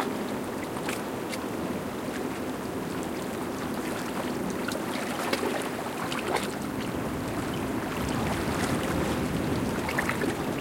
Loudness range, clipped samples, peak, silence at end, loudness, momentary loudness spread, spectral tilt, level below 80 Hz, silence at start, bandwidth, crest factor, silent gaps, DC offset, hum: 4 LU; under 0.1%; -10 dBFS; 0 s; -31 LUFS; 5 LU; -5 dB/octave; -50 dBFS; 0 s; 17 kHz; 20 dB; none; under 0.1%; none